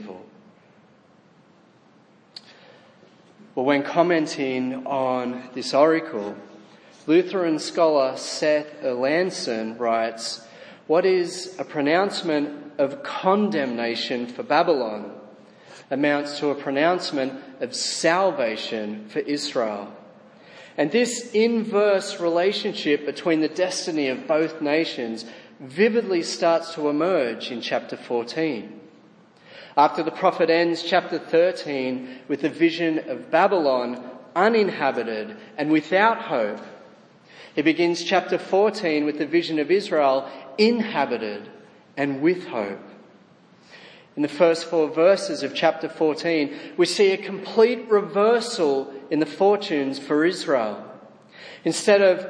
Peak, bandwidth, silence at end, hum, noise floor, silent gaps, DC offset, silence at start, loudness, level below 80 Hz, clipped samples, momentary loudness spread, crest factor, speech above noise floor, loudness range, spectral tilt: -4 dBFS; 10.5 kHz; 0 s; none; -55 dBFS; none; under 0.1%; 0 s; -22 LUFS; -80 dBFS; under 0.1%; 12 LU; 20 dB; 33 dB; 4 LU; -4.5 dB/octave